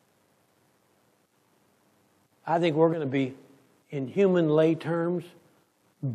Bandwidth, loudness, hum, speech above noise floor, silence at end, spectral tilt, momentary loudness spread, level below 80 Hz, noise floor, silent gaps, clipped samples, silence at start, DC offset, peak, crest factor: 11 kHz; -26 LUFS; none; 42 dB; 0 s; -8 dB/octave; 14 LU; -82 dBFS; -67 dBFS; none; under 0.1%; 2.45 s; under 0.1%; -10 dBFS; 18 dB